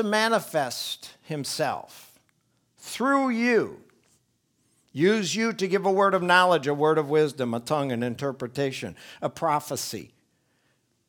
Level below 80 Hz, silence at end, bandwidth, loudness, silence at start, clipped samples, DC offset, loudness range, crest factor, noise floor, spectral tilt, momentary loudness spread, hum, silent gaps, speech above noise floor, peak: -72 dBFS; 1.05 s; 19.5 kHz; -25 LUFS; 0 s; under 0.1%; under 0.1%; 6 LU; 22 dB; -70 dBFS; -4.5 dB/octave; 14 LU; none; none; 45 dB; -4 dBFS